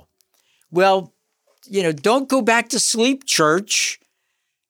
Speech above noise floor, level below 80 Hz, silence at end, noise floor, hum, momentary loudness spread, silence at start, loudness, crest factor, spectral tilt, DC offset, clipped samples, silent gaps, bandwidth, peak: 56 dB; -76 dBFS; 0.75 s; -74 dBFS; none; 7 LU; 0.7 s; -18 LUFS; 18 dB; -2.5 dB/octave; under 0.1%; under 0.1%; none; 19.5 kHz; -2 dBFS